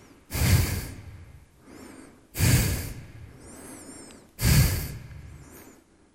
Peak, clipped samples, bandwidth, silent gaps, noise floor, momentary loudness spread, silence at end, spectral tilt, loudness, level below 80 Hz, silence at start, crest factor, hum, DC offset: -10 dBFS; under 0.1%; 16 kHz; none; -54 dBFS; 24 LU; 0.5 s; -4.5 dB/octave; -25 LUFS; -36 dBFS; 0.3 s; 18 dB; none; under 0.1%